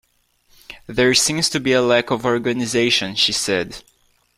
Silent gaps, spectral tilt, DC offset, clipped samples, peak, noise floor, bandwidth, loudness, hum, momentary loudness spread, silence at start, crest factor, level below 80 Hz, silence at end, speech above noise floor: none; -3 dB/octave; under 0.1%; under 0.1%; -2 dBFS; -61 dBFS; 15.5 kHz; -17 LUFS; none; 11 LU; 0.7 s; 18 dB; -50 dBFS; 0.55 s; 42 dB